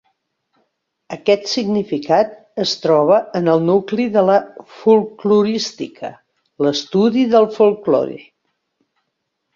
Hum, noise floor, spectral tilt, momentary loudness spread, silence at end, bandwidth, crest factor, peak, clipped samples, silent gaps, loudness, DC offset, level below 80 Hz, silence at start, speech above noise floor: none; -74 dBFS; -5.5 dB/octave; 13 LU; 1.35 s; 7.6 kHz; 16 dB; -2 dBFS; under 0.1%; none; -16 LUFS; under 0.1%; -62 dBFS; 1.1 s; 58 dB